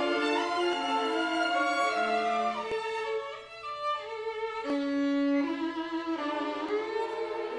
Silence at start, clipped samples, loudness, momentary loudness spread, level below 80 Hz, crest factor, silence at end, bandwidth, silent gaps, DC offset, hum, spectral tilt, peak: 0 s; under 0.1%; -30 LUFS; 7 LU; -70 dBFS; 14 dB; 0 s; 10.5 kHz; none; under 0.1%; none; -3 dB/octave; -16 dBFS